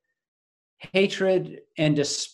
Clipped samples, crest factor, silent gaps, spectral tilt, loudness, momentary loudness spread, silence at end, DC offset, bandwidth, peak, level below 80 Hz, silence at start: under 0.1%; 20 dB; none; -4.5 dB/octave; -24 LUFS; 5 LU; 0.05 s; under 0.1%; 12 kHz; -6 dBFS; -70 dBFS; 0.8 s